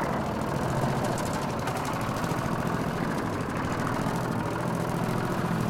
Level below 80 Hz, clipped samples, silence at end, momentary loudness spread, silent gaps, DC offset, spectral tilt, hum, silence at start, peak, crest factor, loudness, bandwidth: -46 dBFS; under 0.1%; 0 s; 2 LU; none; under 0.1%; -6 dB/octave; none; 0 s; -16 dBFS; 14 dB; -29 LUFS; 17 kHz